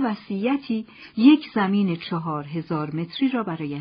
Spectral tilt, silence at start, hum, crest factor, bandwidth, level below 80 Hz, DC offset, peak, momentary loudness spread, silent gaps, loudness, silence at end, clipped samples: -5.5 dB/octave; 0 s; none; 18 dB; 5.2 kHz; -66 dBFS; under 0.1%; -4 dBFS; 13 LU; none; -23 LUFS; 0 s; under 0.1%